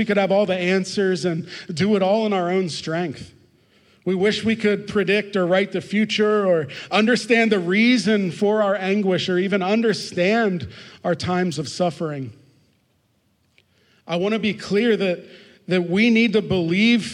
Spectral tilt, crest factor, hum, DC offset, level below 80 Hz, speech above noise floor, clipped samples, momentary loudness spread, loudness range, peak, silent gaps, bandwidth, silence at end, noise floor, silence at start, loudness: -5.5 dB/octave; 16 dB; none; under 0.1%; -62 dBFS; 45 dB; under 0.1%; 10 LU; 8 LU; -6 dBFS; none; 11 kHz; 0 s; -65 dBFS; 0 s; -20 LUFS